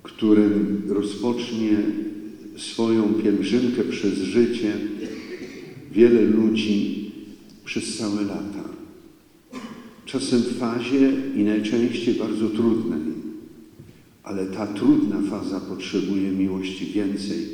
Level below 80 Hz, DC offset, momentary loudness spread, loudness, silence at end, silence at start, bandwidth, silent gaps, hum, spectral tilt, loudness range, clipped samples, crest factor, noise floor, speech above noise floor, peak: -62 dBFS; under 0.1%; 18 LU; -23 LUFS; 0 s; 0.05 s; 11.5 kHz; none; none; -6 dB/octave; 6 LU; under 0.1%; 20 dB; -51 dBFS; 29 dB; -2 dBFS